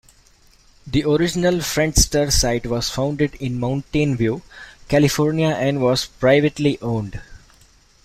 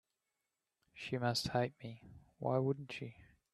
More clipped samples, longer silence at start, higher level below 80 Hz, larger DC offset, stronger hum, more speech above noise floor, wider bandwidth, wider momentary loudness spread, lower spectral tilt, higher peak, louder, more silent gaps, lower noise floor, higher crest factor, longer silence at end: neither; about the same, 0.85 s vs 0.95 s; first, -34 dBFS vs -70 dBFS; neither; neither; second, 34 dB vs 51 dB; first, 16 kHz vs 13 kHz; second, 8 LU vs 16 LU; about the same, -4.5 dB/octave vs -5.5 dB/octave; first, -2 dBFS vs -20 dBFS; first, -19 LUFS vs -39 LUFS; neither; second, -53 dBFS vs -89 dBFS; about the same, 18 dB vs 20 dB; first, 0.65 s vs 0.3 s